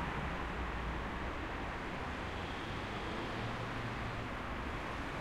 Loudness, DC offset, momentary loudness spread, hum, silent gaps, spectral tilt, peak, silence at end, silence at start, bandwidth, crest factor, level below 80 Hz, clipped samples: -41 LUFS; under 0.1%; 1 LU; none; none; -5.5 dB/octave; -26 dBFS; 0 s; 0 s; 15 kHz; 14 dB; -48 dBFS; under 0.1%